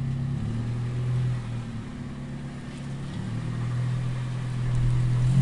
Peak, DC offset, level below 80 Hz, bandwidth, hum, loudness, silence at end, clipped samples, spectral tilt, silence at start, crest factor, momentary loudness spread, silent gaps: -12 dBFS; 0.1%; -40 dBFS; 10.5 kHz; none; -29 LUFS; 0 s; under 0.1%; -7.5 dB/octave; 0 s; 16 dB; 11 LU; none